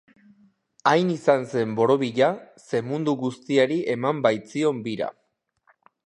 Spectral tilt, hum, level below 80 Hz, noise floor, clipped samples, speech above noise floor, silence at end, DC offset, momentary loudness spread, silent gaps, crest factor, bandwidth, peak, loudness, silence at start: -6 dB/octave; none; -72 dBFS; -70 dBFS; under 0.1%; 47 dB; 0.95 s; under 0.1%; 8 LU; none; 20 dB; 10.5 kHz; -4 dBFS; -23 LUFS; 0.85 s